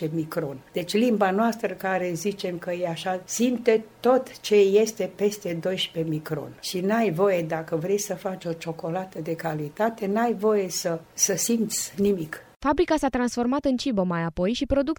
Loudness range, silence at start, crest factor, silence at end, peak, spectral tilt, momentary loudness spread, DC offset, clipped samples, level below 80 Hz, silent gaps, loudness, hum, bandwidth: 3 LU; 0 s; 18 dB; 0.05 s; -6 dBFS; -4.5 dB/octave; 9 LU; under 0.1%; under 0.1%; -50 dBFS; 12.56-12.60 s; -25 LUFS; none; over 20 kHz